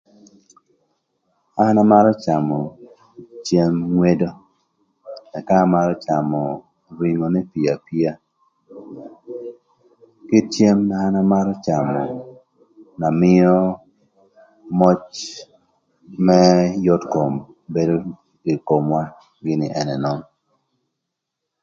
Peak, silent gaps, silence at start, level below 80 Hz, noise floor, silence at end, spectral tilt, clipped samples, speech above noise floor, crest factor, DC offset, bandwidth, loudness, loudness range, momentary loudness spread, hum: 0 dBFS; none; 1.55 s; -54 dBFS; -80 dBFS; 1.4 s; -7.5 dB/octave; under 0.1%; 63 dB; 20 dB; under 0.1%; 7.6 kHz; -18 LUFS; 6 LU; 20 LU; none